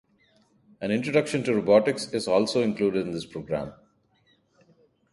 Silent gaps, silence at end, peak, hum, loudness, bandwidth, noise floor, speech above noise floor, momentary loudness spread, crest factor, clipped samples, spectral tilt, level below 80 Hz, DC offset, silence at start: none; 1.4 s; -6 dBFS; none; -25 LUFS; 11.5 kHz; -66 dBFS; 41 dB; 12 LU; 20 dB; under 0.1%; -5.5 dB/octave; -62 dBFS; under 0.1%; 0.8 s